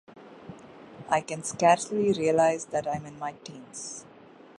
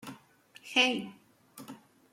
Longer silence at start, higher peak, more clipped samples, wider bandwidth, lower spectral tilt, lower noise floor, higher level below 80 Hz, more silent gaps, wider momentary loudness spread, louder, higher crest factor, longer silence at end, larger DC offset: about the same, 0.1 s vs 0.05 s; about the same, -8 dBFS vs -10 dBFS; neither; second, 11.5 kHz vs 16.5 kHz; first, -4.5 dB/octave vs -2 dB/octave; second, -47 dBFS vs -59 dBFS; first, -66 dBFS vs -82 dBFS; neither; about the same, 24 LU vs 25 LU; about the same, -27 LUFS vs -28 LUFS; second, 20 dB vs 26 dB; first, 0.55 s vs 0.35 s; neither